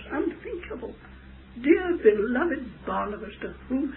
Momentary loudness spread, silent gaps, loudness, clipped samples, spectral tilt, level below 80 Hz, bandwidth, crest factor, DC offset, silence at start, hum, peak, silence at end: 17 LU; none; -26 LUFS; under 0.1%; -10.5 dB/octave; -48 dBFS; 4.1 kHz; 20 dB; under 0.1%; 0 s; none; -6 dBFS; 0 s